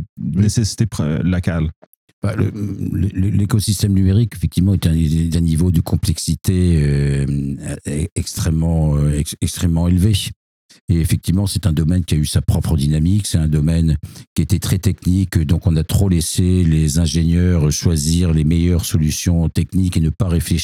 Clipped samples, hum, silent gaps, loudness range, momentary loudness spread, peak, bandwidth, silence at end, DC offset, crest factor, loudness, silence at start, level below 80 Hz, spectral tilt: under 0.1%; none; 0.09-0.16 s, 1.76-2.22 s, 8.12-8.16 s, 10.36-10.69 s, 10.81-10.88 s, 14.27-14.36 s; 3 LU; 6 LU; -2 dBFS; 16 kHz; 0 s; under 0.1%; 14 dB; -17 LUFS; 0 s; -28 dBFS; -6 dB/octave